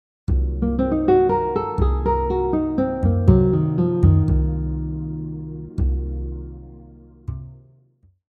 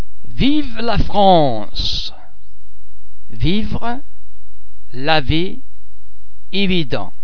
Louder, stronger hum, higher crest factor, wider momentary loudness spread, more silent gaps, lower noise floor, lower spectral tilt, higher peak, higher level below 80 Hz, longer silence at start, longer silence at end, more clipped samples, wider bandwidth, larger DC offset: second, -21 LUFS vs -18 LUFS; neither; about the same, 20 dB vs 20 dB; about the same, 17 LU vs 15 LU; neither; first, -57 dBFS vs -48 dBFS; first, -11.5 dB/octave vs -6.5 dB/octave; about the same, 0 dBFS vs 0 dBFS; about the same, -26 dBFS vs -28 dBFS; first, 0.3 s vs 0 s; first, 0.7 s vs 0.15 s; neither; second, 4.5 kHz vs 5.4 kHz; second, under 0.1% vs 30%